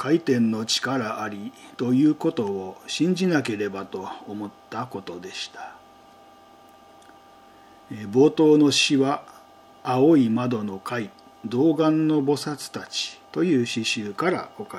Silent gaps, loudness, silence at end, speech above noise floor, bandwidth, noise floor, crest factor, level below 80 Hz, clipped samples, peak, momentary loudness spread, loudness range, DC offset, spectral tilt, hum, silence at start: none; -23 LUFS; 0 s; 28 dB; 13.5 kHz; -51 dBFS; 18 dB; -74 dBFS; under 0.1%; -6 dBFS; 17 LU; 15 LU; under 0.1%; -5 dB/octave; none; 0 s